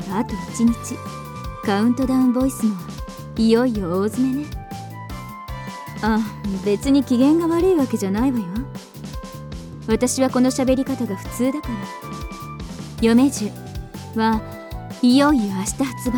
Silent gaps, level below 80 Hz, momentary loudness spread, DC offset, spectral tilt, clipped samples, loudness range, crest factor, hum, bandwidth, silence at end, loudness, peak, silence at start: none; -38 dBFS; 17 LU; under 0.1%; -5.5 dB/octave; under 0.1%; 3 LU; 18 dB; none; 19 kHz; 0 s; -20 LUFS; -4 dBFS; 0 s